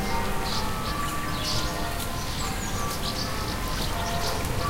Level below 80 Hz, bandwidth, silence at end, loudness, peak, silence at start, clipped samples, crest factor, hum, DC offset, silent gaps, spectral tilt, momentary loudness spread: -34 dBFS; 16.5 kHz; 0 s; -29 LUFS; -12 dBFS; 0 s; under 0.1%; 16 dB; none; under 0.1%; none; -3.5 dB/octave; 3 LU